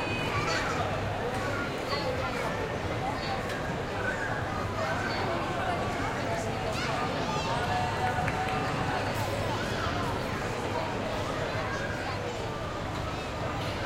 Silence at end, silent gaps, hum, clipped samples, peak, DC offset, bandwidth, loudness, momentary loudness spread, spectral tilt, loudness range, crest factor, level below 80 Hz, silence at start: 0 s; none; none; under 0.1%; -14 dBFS; under 0.1%; 16.5 kHz; -31 LUFS; 4 LU; -5 dB/octave; 2 LU; 16 dB; -46 dBFS; 0 s